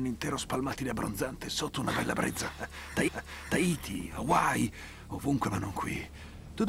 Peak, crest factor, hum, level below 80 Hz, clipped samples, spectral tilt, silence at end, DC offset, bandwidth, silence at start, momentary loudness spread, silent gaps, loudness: -12 dBFS; 20 dB; none; -50 dBFS; under 0.1%; -4.5 dB/octave; 0 s; under 0.1%; 16 kHz; 0 s; 11 LU; none; -32 LUFS